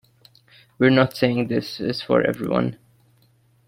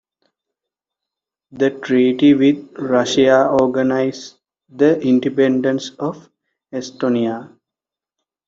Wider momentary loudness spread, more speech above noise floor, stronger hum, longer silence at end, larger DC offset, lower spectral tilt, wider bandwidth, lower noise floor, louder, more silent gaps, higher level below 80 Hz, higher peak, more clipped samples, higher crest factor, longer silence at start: second, 10 LU vs 15 LU; second, 39 dB vs 71 dB; neither; about the same, 0.95 s vs 1 s; neither; first, -7 dB/octave vs -5.5 dB/octave; first, 16.5 kHz vs 7.8 kHz; second, -59 dBFS vs -87 dBFS; second, -21 LUFS vs -16 LUFS; neither; about the same, -58 dBFS vs -60 dBFS; about the same, -4 dBFS vs -2 dBFS; neither; about the same, 20 dB vs 16 dB; second, 0.8 s vs 1.55 s